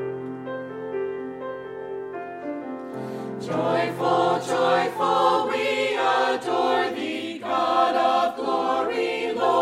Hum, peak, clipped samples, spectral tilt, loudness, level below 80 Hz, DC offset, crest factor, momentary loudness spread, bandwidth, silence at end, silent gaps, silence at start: none; -8 dBFS; under 0.1%; -4.5 dB/octave; -24 LUFS; -70 dBFS; under 0.1%; 16 dB; 13 LU; 14.5 kHz; 0 s; none; 0 s